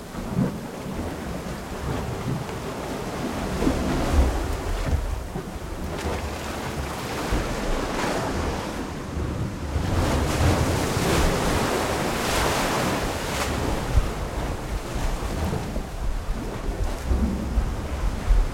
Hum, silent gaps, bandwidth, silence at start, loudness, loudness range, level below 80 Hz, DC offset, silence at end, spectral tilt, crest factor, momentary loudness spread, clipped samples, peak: none; none; 16.5 kHz; 0 s; -27 LUFS; 6 LU; -30 dBFS; under 0.1%; 0 s; -5 dB/octave; 18 dB; 9 LU; under 0.1%; -8 dBFS